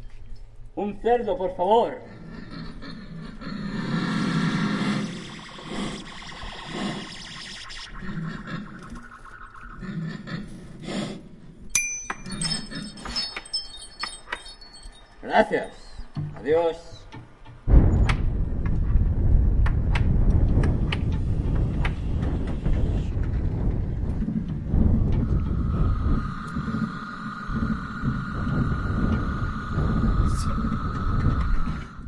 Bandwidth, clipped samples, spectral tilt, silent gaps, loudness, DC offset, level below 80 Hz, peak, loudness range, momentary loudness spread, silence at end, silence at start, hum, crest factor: 11.5 kHz; under 0.1%; -5.5 dB/octave; none; -27 LUFS; under 0.1%; -28 dBFS; -4 dBFS; 10 LU; 17 LU; 0 s; 0 s; none; 22 dB